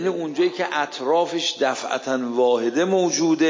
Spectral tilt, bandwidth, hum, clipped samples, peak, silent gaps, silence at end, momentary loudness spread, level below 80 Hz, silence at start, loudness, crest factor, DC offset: -3.5 dB/octave; 7.6 kHz; none; under 0.1%; -8 dBFS; none; 0 s; 5 LU; -80 dBFS; 0 s; -22 LUFS; 12 dB; under 0.1%